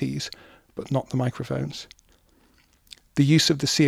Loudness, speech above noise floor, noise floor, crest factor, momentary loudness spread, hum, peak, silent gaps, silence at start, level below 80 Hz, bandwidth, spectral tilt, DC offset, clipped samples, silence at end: -24 LUFS; 37 dB; -60 dBFS; 18 dB; 21 LU; none; -8 dBFS; none; 0 s; -58 dBFS; 15.5 kHz; -5 dB/octave; under 0.1%; under 0.1%; 0 s